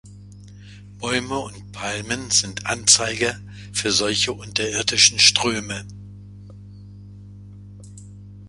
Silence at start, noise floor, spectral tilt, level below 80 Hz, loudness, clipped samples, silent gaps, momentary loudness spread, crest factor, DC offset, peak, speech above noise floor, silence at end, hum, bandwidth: 0.05 s; -41 dBFS; -1.5 dB/octave; -50 dBFS; -19 LUFS; under 0.1%; none; 17 LU; 24 dB; under 0.1%; 0 dBFS; 20 dB; 0 s; 50 Hz at -35 dBFS; 11.5 kHz